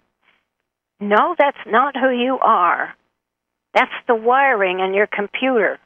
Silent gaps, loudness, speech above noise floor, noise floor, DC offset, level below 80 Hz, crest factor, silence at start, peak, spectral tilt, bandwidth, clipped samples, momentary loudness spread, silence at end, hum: none; -17 LUFS; 62 dB; -79 dBFS; under 0.1%; -70 dBFS; 18 dB; 1 s; 0 dBFS; -6 dB/octave; 7.8 kHz; under 0.1%; 6 LU; 0.1 s; none